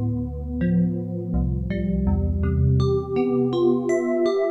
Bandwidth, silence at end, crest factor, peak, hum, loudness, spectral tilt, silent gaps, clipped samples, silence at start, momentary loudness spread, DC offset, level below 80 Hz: 7.8 kHz; 0 s; 12 dB; -10 dBFS; none; -23 LUFS; -9 dB/octave; none; under 0.1%; 0 s; 6 LU; under 0.1%; -30 dBFS